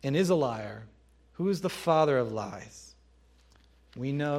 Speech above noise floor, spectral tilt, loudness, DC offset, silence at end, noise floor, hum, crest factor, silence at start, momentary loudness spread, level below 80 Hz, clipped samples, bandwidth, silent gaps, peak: 32 dB; -6.5 dB/octave; -29 LUFS; under 0.1%; 0 s; -61 dBFS; none; 20 dB; 0.05 s; 22 LU; -62 dBFS; under 0.1%; 16 kHz; none; -10 dBFS